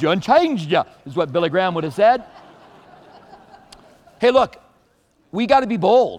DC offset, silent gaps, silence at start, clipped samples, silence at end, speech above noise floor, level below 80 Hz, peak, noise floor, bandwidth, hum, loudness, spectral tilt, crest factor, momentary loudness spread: under 0.1%; none; 0 s; under 0.1%; 0 s; 43 dB; -56 dBFS; -2 dBFS; -60 dBFS; 11 kHz; none; -18 LUFS; -6 dB/octave; 18 dB; 9 LU